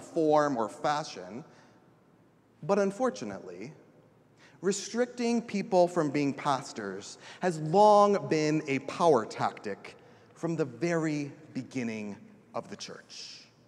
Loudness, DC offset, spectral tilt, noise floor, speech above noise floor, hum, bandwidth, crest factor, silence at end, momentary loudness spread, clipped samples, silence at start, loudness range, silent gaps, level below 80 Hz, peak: -29 LUFS; under 0.1%; -5.5 dB/octave; -62 dBFS; 33 dB; none; 12 kHz; 20 dB; 0.25 s; 18 LU; under 0.1%; 0 s; 9 LU; none; -78 dBFS; -10 dBFS